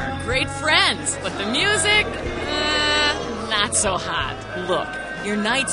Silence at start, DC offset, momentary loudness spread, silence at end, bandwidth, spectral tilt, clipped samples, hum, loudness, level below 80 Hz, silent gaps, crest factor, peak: 0 s; under 0.1%; 10 LU; 0 s; 11 kHz; -2 dB/octave; under 0.1%; none; -20 LUFS; -40 dBFS; none; 20 dB; -2 dBFS